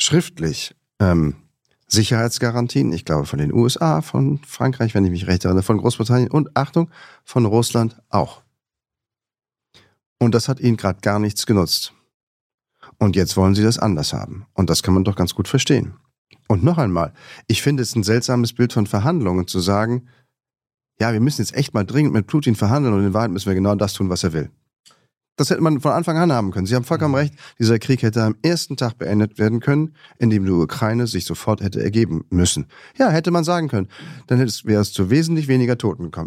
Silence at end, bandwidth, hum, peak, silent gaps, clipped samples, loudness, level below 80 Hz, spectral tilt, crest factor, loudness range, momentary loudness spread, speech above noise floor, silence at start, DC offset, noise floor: 0 s; 15.5 kHz; none; 0 dBFS; 10.06-10.16 s, 12.14-12.58 s, 16.18-16.25 s, 24.80-24.84 s; under 0.1%; -19 LUFS; -46 dBFS; -5.5 dB/octave; 18 dB; 2 LU; 7 LU; 69 dB; 0 s; under 0.1%; -87 dBFS